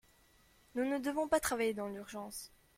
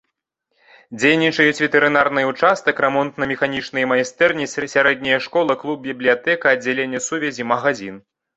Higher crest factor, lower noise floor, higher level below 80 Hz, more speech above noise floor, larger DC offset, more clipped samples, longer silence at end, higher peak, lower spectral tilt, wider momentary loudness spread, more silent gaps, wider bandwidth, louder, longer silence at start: about the same, 20 dB vs 18 dB; second, -67 dBFS vs -75 dBFS; about the same, -64 dBFS vs -60 dBFS; second, 31 dB vs 56 dB; neither; neither; about the same, 0.3 s vs 0.35 s; second, -18 dBFS vs 0 dBFS; about the same, -3.5 dB/octave vs -4 dB/octave; first, 12 LU vs 8 LU; neither; first, 16.5 kHz vs 8.2 kHz; second, -37 LUFS vs -18 LUFS; second, 0.75 s vs 0.9 s